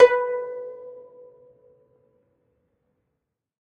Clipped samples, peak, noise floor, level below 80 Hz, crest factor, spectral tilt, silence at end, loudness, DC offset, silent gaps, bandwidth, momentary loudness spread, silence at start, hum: under 0.1%; -2 dBFS; -81 dBFS; -70 dBFS; 24 dB; -3 dB/octave; 2.75 s; -24 LUFS; under 0.1%; none; 6.8 kHz; 25 LU; 0 s; none